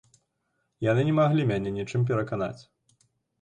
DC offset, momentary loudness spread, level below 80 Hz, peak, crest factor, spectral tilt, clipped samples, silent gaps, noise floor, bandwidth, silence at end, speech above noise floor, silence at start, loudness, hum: under 0.1%; 10 LU; -58 dBFS; -12 dBFS; 16 dB; -8 dB/octave; under 0.1%; none; -77 dBFS; 9.2 kHz; 0.8 s; 51 dB; 0.8 s; -26 LUFS; none